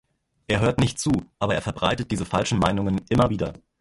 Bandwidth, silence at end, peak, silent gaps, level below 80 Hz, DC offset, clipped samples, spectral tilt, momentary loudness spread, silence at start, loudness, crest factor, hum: 11.5 kHz; 0.25 s; -4 dBFS; none; -42 dBFS; under 0.1%; under 0.1%; -5.5 dB/octave; 5 LU; 0.5 s; -24 LUFS; 20 dB; none